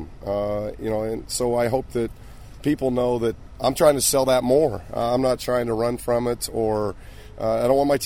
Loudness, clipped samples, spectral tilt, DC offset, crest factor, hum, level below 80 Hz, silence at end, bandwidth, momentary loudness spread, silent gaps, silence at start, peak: -23 LUFS; under 0.1%; -4.5 dB/octave; 0.4%; 18 dB; none; -42 dBFS; 0 s; 16 kHz; 10 LU; none; 0 s; -4 dBFS